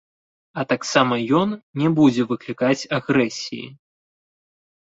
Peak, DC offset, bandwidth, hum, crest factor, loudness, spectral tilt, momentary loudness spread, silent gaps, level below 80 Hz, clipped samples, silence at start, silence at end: -2 dBFS; under 0.1%; 8 kHz; none; 20 dB; -20 LUFS; -5.5 dB/octave; 14 LU; 1.63-1.74 s; -62 dBFS; under 0.1%; 0.55 s; 1.1 s